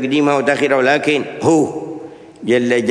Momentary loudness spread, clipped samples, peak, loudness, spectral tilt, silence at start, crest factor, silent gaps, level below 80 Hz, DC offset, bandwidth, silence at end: 15 LU; under 0.1%; 0 dBFS; -15 LUFS; -5 dB/octave; 0 s; 16 dB; none; -62 dBFS; under 0.1%; 10.5 kHz; 0 s